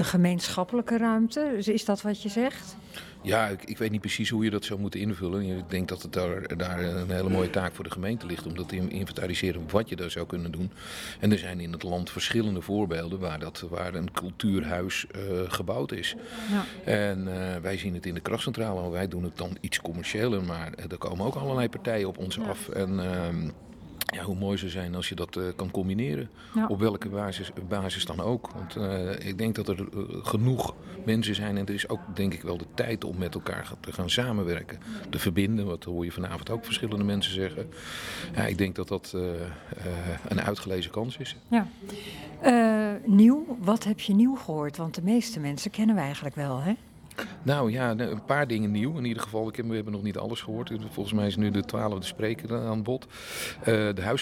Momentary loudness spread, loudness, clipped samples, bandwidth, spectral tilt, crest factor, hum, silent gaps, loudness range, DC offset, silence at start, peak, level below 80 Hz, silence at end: 9 LU; -29 LUFS; under 0.1%; 16.5 kHz; -5.5 dB/octave; 22 dB; none; none; 7 LU; under 0.1%; 0 s; -6 dBFS; -56 dBFS; 0 s